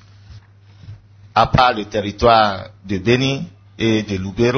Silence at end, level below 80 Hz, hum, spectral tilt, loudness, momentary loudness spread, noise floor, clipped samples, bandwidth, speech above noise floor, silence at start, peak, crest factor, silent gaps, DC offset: 0 s; -38 dBFS; none; -6 dB/octave; -17 LUFS; 13 LU; -44 dBFS; under 0.1%; 6.6 kHz; 28 dB; 0.3 s; 0 dBFS; 18 dB; none; under 0.1%